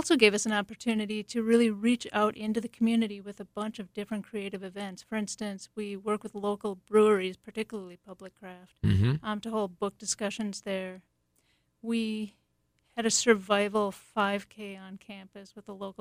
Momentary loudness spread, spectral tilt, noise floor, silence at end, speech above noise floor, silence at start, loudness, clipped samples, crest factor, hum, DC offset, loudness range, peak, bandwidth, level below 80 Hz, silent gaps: 19 LU; -4.5 dB/octave; -74 dBFS; 0.1 s; 44 dB; 0 s; -30 LUFS; under 0.1%; 24 dB; none; under 0.1%; 6 LU; -6 dBFS; 15.5 kHz; -60 dBFS; none